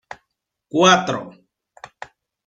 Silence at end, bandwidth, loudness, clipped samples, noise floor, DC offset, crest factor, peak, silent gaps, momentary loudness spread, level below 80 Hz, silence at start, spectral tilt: 1.2 s; 9.2 kHz; -17 LUFS; under 0.1%; -77 dBFS; under 0.1%; 20 dB; -2 dBFS; none; 26 LU; -64 dBFS; 0.75 s; -3.5 dB/octave